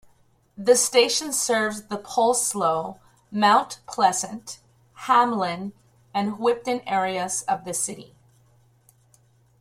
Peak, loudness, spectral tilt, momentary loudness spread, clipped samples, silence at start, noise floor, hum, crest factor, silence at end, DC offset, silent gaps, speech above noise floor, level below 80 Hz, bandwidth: -6 dBFS; -23 LUFS; -2.5 dB/octave; 15 LU; under 0.1%; 0.6 s; -60 dBFS; none; 20 dB; 1.55 s; under 0.1%; none; 38 dB; -66 dBFS; 16 kHz